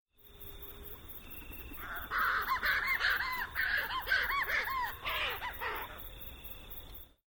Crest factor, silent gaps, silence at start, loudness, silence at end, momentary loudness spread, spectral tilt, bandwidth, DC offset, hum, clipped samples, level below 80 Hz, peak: 18 dB; none; 0.2 s; -33 LUFS; 0.2 s; 16 LU; -2.5 dB/octave; over 20 kHz; under 0.1%; none; under 0.1%; -52 dBFS; -18 dBFS